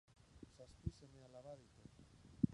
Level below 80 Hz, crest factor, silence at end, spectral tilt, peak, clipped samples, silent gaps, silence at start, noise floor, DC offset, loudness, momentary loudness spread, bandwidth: -64 dBFS; 30 dB; 0 s; -8.5 dB/octave; -20 dBFS; under 0.1%; none; 0.35 s; -65 dBFS; under 0.1%; -53 LUFS; 13 LU; 11 kHz